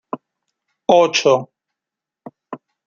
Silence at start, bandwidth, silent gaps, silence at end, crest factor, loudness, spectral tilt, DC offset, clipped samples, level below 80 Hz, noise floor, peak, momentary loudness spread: 0.15 s; 7.2 kHz; none; 0.3 s; 18 dB; -15 LUFS; -3.5 dB/octave; under 0.1%; under 0.1%; -66 dBFS; -86 dBFS; -2 dBFS; 23 LU